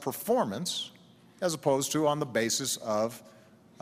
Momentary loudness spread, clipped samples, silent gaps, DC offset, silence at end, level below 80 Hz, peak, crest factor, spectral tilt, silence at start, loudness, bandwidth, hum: 7 LU; under 0.1%; none; under 0.1%; 0.5 s; -72 dBFS; -14 dBFS; 18 dB; -3.5 dB/octave; 0 s; -29 LUFS; 15.5 kHz; none